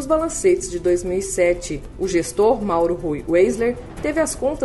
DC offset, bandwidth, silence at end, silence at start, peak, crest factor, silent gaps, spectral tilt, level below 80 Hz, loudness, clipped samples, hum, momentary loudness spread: under 0.1%; 12 kHz; 0 s; 0 s; -6 dBFS; 14 dB; none; -5 dB/octave; -38 dBFS; -20 LUFS; under 0.1%; none; 7 LU